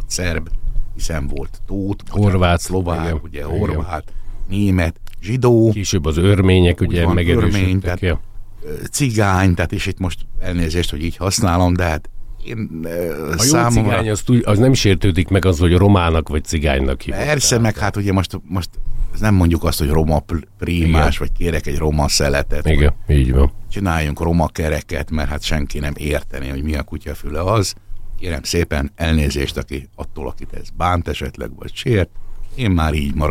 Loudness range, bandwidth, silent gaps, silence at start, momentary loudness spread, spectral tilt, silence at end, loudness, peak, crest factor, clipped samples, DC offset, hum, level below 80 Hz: 6 LU; 16 kHz; none; 0 s; 14 LU; -5.5 dB/octave; 0 s; -18 LUFS; -2 dBFS; 14 dB; under 0.1%; under 0.1%; none; -24 dBFS